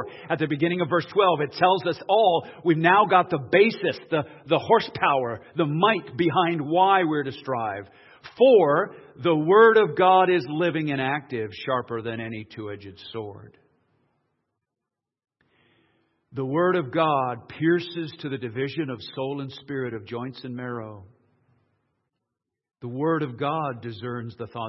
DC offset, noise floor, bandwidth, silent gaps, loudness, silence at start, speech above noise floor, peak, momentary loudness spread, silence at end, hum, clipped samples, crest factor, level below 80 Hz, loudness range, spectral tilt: under 0.1%; -87 dBFS; 6 kHz; none; -23 LUFS; 0 s; 63 dB; -4 dBFS; 16 LU; 0 s; none; under 0.1%; 20 dB; -70 dBFS; 15 LU; -8.5 dB/octave